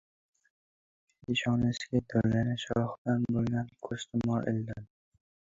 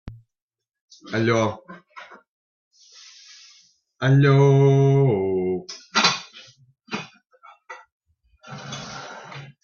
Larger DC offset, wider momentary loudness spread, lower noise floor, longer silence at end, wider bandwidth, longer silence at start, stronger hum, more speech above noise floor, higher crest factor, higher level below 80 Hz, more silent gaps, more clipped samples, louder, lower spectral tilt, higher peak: neither; second, 10 LU vs 27 LU; first, under -90 dBFS vs -57 dBFS; first, 0.65 s vs 0.15 s; about the same, 7.8 kHz vs 7.2 kHz; first, 1.3 s vs 0.05 s; neither; first, over 59 dB vs 39 dB; about the same, 18 dB vs 22 dB; about the same, -56 dBFS vs -58 dBFS; second, 2.98-3.05 s vs 0.42-0.48 s, 0.81-0.88 s, 2.29-2.71 s, 7.92-8.00 s; neither; second, -31 LUFS vs -20 LUFS; about the same, -6.5 dB/octave vs -6 dB/octave; second, -14 dBFS vs -2 dBFS